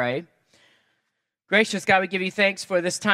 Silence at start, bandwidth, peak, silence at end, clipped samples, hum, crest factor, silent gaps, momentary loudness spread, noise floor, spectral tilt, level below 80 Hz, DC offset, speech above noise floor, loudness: 0 s; 15.5 kHz; -2 dBFS; 0 s; under 0.1%; none; 22 dB; none; 6 LU; -78 dBFS; -3.5 dB/octave; -70 dBFS; under 0.1%; 55 dB; -22 LUFS